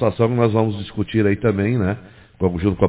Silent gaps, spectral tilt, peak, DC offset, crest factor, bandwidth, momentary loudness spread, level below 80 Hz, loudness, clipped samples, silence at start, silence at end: none; -12 dB/octave; 0 dBFS; under 0.1%; 18 dB; 4 kHz; 7 LU; -38 dBFS; -20 LUFS; under 0.1%; 0 s; 0 s